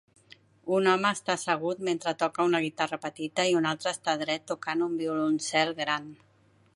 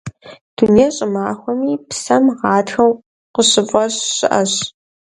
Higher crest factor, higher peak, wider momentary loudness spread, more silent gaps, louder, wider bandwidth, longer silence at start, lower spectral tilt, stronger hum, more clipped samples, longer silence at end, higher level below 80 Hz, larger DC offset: about the same, 20 dB vs 16 dB; second, -8 dBFS vs 0 dBFS; second, 6 LU vs 11 LU; second, none vs 0.41-0.57 s, 3.06-3.34 s; second, -28 LUFS vs -15 LUFS; about the same, 11.5 kHz vs 11.5 kHz; first, 0.65 s vs 0.05 s; about the same, -4 dB/octave vs -3.5 dB/octave; neither; neither; first, 0.6 s vs 0.35 s; second, -78 dBFS vs -52 dBFS; neither